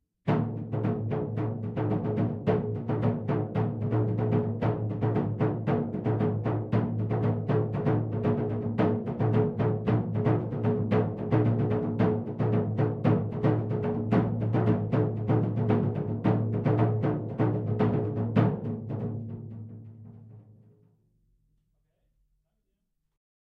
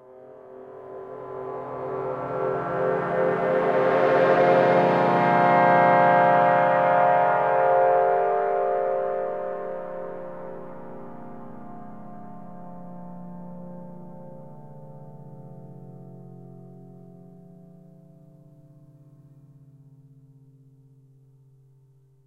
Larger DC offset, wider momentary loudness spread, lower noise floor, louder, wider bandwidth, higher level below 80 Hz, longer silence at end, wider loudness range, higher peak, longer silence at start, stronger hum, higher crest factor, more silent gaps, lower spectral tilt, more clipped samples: neither; second, 5 LU vs 26 LU; first, -78 dBFS vs -58 dBFS; second, -28 LUFS vs -21 LUFS; second, 4.7 kHz vs 6.6 kHz; first, -54 dBFS vs -66 dBFS; second, 2.95 s vs 5.2 s; second, 3 LU vs 24 LU; second, -10 dBFS vs -6 dBFS; about the same, 0.25 s vs 0.15 s; neither; about the same, 18 dB vs 20 dB; neither; first, -11 dB/octave vs -8 dB/octave; neither